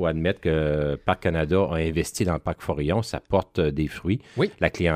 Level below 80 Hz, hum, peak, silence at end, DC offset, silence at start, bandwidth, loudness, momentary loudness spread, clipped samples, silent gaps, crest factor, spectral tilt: -40 dBFS; none; -4 dBFS; 0 s; under 0.1%; 0 s; 15.5 kHz; -25 LUFS; 5 LU; under 0.1%; none; 20 dB; -6.5 dB/octave